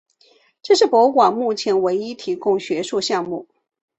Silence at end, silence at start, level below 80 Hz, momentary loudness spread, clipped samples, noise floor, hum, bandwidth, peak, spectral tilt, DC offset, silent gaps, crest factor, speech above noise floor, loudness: 0.55 s; 0.65 s; -66 dBFS; 12 LU; under 0.1%; -57 dBFS; none; 8.4 kHz; -2 dBFS; -4 dB/octave; under 0.1%; none; 18 dB; 39 dB; -18 LUFS